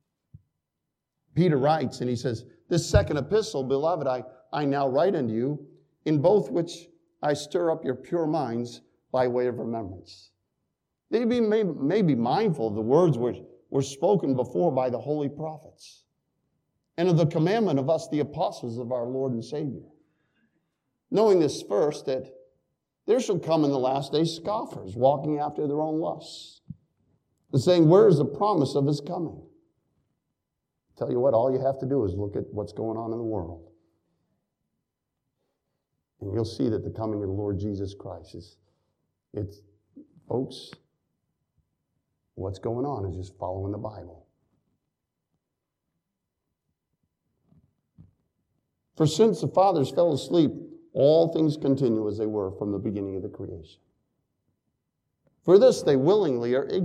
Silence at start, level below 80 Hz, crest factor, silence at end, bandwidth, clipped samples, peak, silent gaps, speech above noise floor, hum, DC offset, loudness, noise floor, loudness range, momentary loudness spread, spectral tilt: 1.35 s; -54 dBFS; 22 dB; 0 s; 12.5 kHz; under 0.1%; -4 dBFS; none; 59 dB; none; under 0.1%; -25 LUFS; -84 dBFS; 12 LU; 15 LU; -7 dB/octave